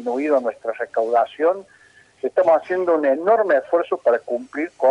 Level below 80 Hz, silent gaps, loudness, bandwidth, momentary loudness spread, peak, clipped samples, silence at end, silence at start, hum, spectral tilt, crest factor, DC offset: -72 dBFS; none; -20 LUFS; 10 kHz; 10 LU; -6 dBFS; under 0.1%; 0 s; 0 s; none; -6 dB/octave; 14 dB; under 0.1%